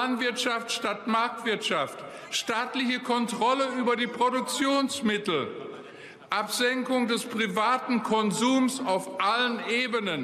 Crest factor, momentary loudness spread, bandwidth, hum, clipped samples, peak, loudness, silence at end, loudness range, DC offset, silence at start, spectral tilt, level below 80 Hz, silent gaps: 14 dB; 6 LU; 14.5 kHz; none; under 0.1%; -12 dBFS; -27 LUFS; 0 s; 2 LU; under 0.1%; 0 s; -3 dB/octave; -76 dBFS; none